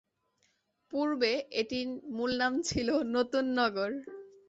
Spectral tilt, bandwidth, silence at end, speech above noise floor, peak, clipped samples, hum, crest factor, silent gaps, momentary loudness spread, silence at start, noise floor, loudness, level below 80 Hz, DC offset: -4 dB/octave; 8.4 kHz; 0.2 s; 44 dB; -16 dBFS; under 0.1%; none; 16 dB; none; 8 LU; 0.9 s; -75 dBFS; -31 LUFS; -60 dBFS; under 0.1%